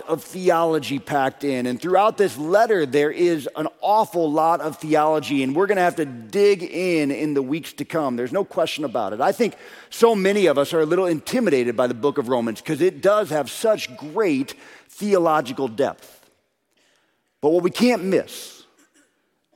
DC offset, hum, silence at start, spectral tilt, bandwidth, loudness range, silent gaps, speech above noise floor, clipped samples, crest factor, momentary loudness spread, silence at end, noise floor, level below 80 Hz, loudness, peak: under 0.1%; none; 0 s; -5.5 dB/octave; 16.5 kHz; 4 LU; none; 47 dB; under 0.1%; 20 dB; 7 LU; 1.05 s; -67 dBFS; -70 dBFS; -21 LUFS; -2 dBFS